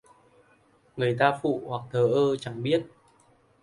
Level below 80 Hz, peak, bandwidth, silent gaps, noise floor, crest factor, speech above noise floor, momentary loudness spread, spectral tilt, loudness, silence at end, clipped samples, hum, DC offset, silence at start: -66 dBFS; -6 dBFS; 11.5 kHz; none; -62 dBFS; 22 dB; 37 dB; 9 LU; -7 dB/octave; -26 LUFS; 0.75 s; under 0.1%; none; under 0.1%; 0.95 s